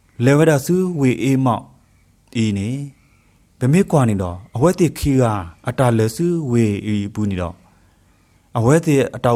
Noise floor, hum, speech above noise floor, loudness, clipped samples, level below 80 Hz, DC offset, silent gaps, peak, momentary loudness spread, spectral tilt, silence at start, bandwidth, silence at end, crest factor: -55 dBFS; none; 38 dB; -18 LUFS; under 0.1%; -44 dBFS; under 0.1%; none; -2 dBFS; 11 LU; -7 dB/octave; 0.2 s; 15.5 kHz; 0 s; 16 dB